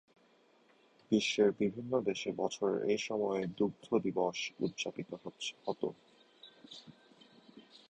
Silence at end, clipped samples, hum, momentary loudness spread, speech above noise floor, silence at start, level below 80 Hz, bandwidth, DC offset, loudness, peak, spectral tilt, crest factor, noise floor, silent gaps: 0.15 s; under 0.1%; none; 15 LU; 33 dB; 1.1 s; -74 dBFS; 9.4 kHz; under 0.1%; -35 LUFS; -16 dBFS; -4.5 dB/octave; 20 dB; -68 dBFS; none